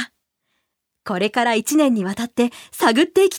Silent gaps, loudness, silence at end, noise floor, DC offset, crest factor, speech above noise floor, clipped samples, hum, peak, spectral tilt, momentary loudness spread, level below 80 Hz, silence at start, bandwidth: none; -19 LUFS; 0 s; -75 dBFS; under 0.1%; 18 dB; 57 dB; under 0.1%; none; -2 dBFS; -4 dB/octave; 11 LU; -64 dBFS; 0 s; 19 kHz